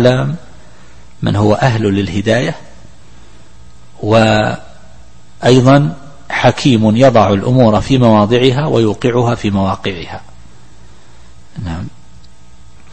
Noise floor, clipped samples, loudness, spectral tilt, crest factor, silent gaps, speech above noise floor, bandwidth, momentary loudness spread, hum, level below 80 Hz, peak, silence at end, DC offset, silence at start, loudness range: -42 dBFS; under 0.1%; -12 LUFS; -6.5 dB/octave; 14 dB; none; 31 dB; 8.8 kHz; 18 LU; none; -38 dBFS; 0 dBFS; 1.05 s; 3%; 0 s; 9 LU